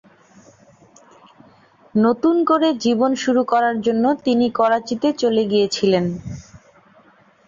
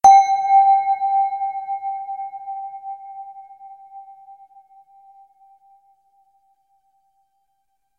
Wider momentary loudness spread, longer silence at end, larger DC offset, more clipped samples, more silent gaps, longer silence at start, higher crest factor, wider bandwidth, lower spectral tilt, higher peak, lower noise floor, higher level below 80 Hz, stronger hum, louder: second, 6 LU vs 27 LU; second, 0.9 s vs 3.65 s; neither; neither; neither; first, 1.95 s vs 0.05 s; about the same, 16 dB vs 20 dB; second, 7.6 kHz vs 10.5 kHz; first, -5.5 dB/octave vs -0.5 dB/octave; about the same, -4 dBFS vs -2 dBFS; second, -52 dBFS vs -72 dBFS; first, -56 dBFS vs -64 dBFS; neither; about the same, -18 LUFS vs -19 LUFS